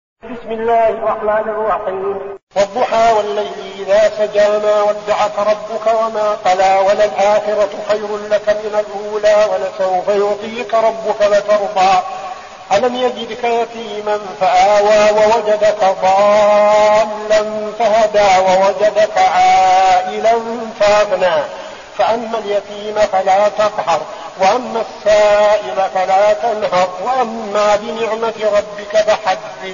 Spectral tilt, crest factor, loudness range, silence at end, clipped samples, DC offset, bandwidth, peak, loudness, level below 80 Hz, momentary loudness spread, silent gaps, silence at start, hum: -1.5 dB/octave; 12 dB; 4 LU; 0 s; under 0.1%; under 0.1%; 7.4 kHz; -2 dBFS; -14 LUFS; -48 dBFS; 10 LU; 2.43-2.47 s; 0.25 s; none